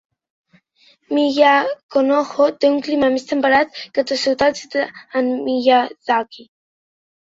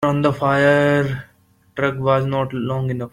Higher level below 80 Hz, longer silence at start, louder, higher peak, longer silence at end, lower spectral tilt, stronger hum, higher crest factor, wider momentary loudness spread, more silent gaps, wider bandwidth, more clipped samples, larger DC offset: second, -58 dBFS vs -50 dBFS; first, 1.1 s vs 0 s; about the same, -17 LUFS vs -18 LUFS; about the same, -2 dBFS vs -4 dBFS; first, 0.95 s vs 0.05 s; second, -3.5 dB/octave vs -7.5 dB/octave; neither; about the same, 16 dB vs 14 dB; about the same, 9 LU vs 10 LU; first, 1.83-1.89 s vs none; second, 7.8 kHz vs 11 kHz; neither; neither